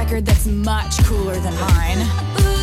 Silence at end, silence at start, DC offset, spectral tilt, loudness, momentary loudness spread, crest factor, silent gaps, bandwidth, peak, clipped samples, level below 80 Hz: 0 s; 0 s; under 0.1%; -5.5 dB/octave; -18 LUFS; 4 LU; 12 dB; none; 16 kHz; -4 dBFS; under 0.1%; -20 dBFS